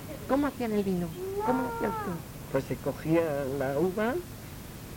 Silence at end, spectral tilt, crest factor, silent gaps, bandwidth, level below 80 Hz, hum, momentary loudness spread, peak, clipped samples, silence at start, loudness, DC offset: 0 s; -6.5 dB/octave; 18 dB; none; 17 kHz; -50 dBFS; none; 10 LU; -12 dBFS; under 0.1%; 0 s; -30 LUFS; under 0.1%